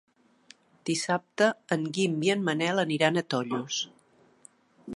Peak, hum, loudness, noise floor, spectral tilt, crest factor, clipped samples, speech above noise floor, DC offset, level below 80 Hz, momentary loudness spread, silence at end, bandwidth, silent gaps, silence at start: -6 dBFS; none; -28 LUFS; -58 dBFS; -4.5 dB/octave; 22 dB; under 0.1%; 31 dB; under 0.1%; -78 dBFS; 7 LU; 0 s; 11.5 kHz; none; 0.85 s